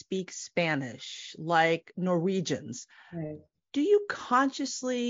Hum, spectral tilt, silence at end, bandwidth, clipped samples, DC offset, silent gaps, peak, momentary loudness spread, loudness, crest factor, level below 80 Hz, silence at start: none; -4 dB/octave; 0 s; 7.6 kHz; under 0.1%; under 0.1%; none; -10 dBFS; 15 LU; -29 LUFS; 20 dB; -74 dBFS; 0.1 s